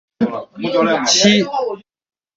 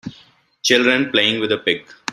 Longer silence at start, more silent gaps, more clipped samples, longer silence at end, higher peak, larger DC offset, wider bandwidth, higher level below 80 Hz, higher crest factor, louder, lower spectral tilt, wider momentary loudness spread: first, 0.2 s vs 0.05 s; neither; neither; first, 0.6 s vs 0 s; about the same, -2 dBFS vs 0 dBFS; neither; second, 8 kHz vs 13.5 kHz; about the same, -58 dBFS vs -62 dBFS; about the same, 16 dB vs 18 dB; about the same, -15 LUFS vs -17 LUFS; about the same, -3 dB/octave vs -2.5 dB/octave; first, 14 LU vs 9 LU